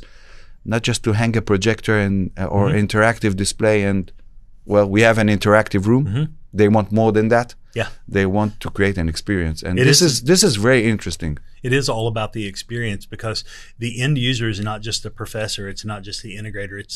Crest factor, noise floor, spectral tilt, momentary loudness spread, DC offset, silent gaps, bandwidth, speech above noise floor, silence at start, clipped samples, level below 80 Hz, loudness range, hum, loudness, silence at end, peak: 18 dB; -39 dBFS; -5 dB/octave; 14 LU; under 0.1%; none; 14 kHz; 21 dB; 0 s; under 0.1%; -38 dBFS; 7 LU; none; -18 LUFS; 0 s; 0 dBFS